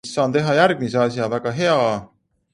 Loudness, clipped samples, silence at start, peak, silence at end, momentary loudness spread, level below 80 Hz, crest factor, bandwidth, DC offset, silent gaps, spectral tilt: -19 LUFS; under 0.1%; 0.05 s; -2 dBFS; 0.5 s; 7 LU; -58 dBFS; 18 dB; 11 kHz; under 0.1%; none; -5.5 dB/octave